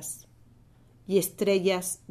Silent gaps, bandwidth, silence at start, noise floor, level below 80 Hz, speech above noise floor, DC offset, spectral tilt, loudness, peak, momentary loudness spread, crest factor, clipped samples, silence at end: none; 14 kHz; 0 s; -57 dBFS; -62 dBFS; 31 dB; under 0.1%; -4 dB/octave; -27 LUFS; -12 dBFS; 12 LU; 18 dB; under 0.1%; 0.15 s